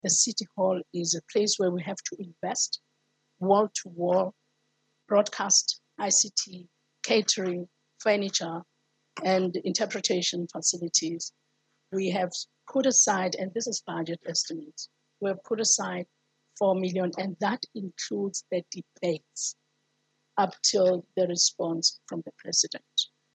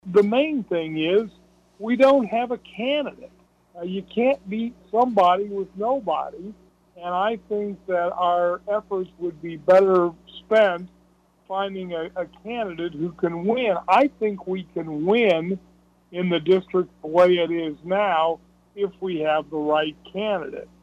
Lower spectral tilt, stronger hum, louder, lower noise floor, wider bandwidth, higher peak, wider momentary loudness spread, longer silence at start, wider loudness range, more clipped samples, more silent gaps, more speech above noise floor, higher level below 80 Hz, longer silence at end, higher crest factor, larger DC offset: second, -2.5 dB/octave vs -7 dB/octave; neither; second, -27 LUFS vs -23 LUFS; first, -75 dBFS vs -59 dBFS; first, 9.6 kHz vs 8 kHz; about the same, -8 dBFS vs -6 dBFS; about the same, 14 LU vs 13 LU; about the same, 0.05 s vs 0.05 s; about the same, 4 LU vs 4 LU; neither; neither; first, 47 dB vs 37 dB; second, -86 dBFS vs -60 dBFS; first, 0.3 s vs 0.15 s; about the same, 20 dB vs 18 dB; neither